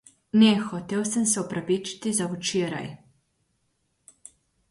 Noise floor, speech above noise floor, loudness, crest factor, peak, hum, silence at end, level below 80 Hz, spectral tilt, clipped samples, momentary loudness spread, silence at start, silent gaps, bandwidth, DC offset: -73 dBFS; 48 dB; -25 LUFS; 20 dB; -8 dBFS; none; 1.75 s; -66 dBFS; -4 dB/octave; under 0.1%; 10 LU; 0.35 s; none; 11.5 kHz; under 0.1%